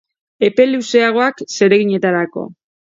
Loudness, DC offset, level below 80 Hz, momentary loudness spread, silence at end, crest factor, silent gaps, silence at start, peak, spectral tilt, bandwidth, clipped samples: -14 LUFS; under 0.1%; -66 dBFS; 9 LU; 0.45 s; 16 dB; none; 0.4 s; 0 dBFS; -5 dB/octave; 7.8 kHz; under 0.1%